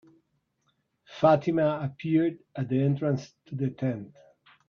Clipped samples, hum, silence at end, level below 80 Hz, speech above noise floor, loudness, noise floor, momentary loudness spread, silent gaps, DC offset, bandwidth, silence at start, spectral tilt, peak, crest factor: under 0.1%; none; 0.6 s; -68 dBFS; 48 dB; -27 LUFS; -74 dBFS; 13 LU; none; under 0.1%; 6.8 kHz; 1.1 s; -8.5 dB/octave; -8 dBFS; 20 dB